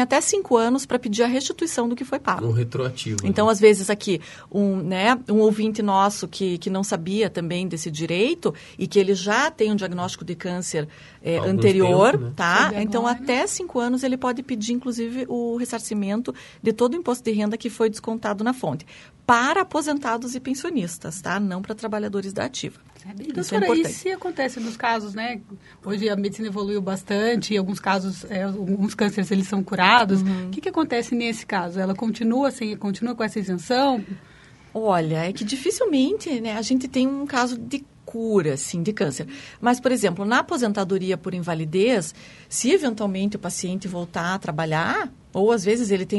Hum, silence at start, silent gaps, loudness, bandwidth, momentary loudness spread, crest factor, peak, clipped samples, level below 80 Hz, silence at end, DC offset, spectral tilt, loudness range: none; 0 s; none; -23 LUFS; 11.5 kHz; 10 LU; 22 dB; 0 dBFS; under 0.1%; -58 dBFS; 0 s; under 0.1%; -5 dB/octave; 5 LU